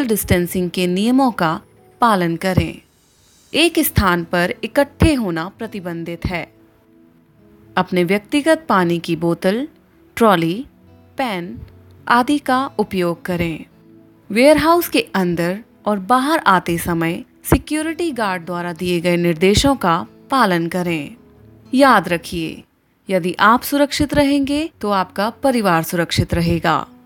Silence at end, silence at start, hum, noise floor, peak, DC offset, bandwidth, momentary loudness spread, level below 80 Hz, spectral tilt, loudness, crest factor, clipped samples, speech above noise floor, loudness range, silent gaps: 0.2 s; 0 s; none; -54 dBFS; 0 dBFS; under 0.1%; 17 kHz; 11 LU; -38 dBFS; -5 dB/octave; -17 LUFS; 18 dB; under 0.1%; 37 dB; 4 LU; none